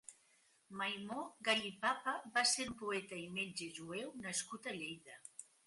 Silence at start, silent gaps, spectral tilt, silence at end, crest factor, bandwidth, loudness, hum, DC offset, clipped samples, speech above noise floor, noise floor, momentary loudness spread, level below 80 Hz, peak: 0.1 s; none; -1.5 dB/octave; 0.25 s; 24 dB; 11.5 kHz; -40 LUFS; none; under 0.1%; under 0.1%; 31 dB; -73 dBFS; 18 LU; -78 dBFS; -20 dBFS